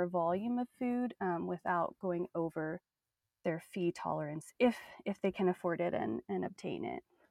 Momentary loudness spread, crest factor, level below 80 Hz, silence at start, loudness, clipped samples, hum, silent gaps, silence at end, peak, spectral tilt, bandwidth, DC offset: 9 LU; 18 dB; -74 dBFS; 0 s; -37 LUFS; under 0.1%; none; none; 0.3 s; -18 dBFS; -7 dB/octave; 14.5 kHz; under 0.1%